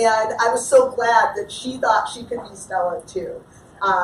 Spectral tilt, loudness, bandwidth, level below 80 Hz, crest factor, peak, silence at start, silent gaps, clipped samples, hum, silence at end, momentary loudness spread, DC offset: -2.5 dB/octave; -20 LUFS; 14 kHz; -56 dBFS; 18 dB; -2 dBFS; 0 s; none; under 0.1%; none; 0 s; 15 LU; under 0.1%